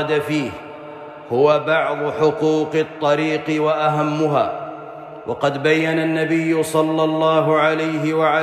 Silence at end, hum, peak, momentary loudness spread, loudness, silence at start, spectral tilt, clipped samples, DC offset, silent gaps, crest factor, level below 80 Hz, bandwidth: 0 s; none; -4 dBFS; 16 LU; -18 LUFS; 0 s; -6 dB/octave; under 0.1%; under 0.1%; none; 14 dB; -62 dBFS; 14.5 kHz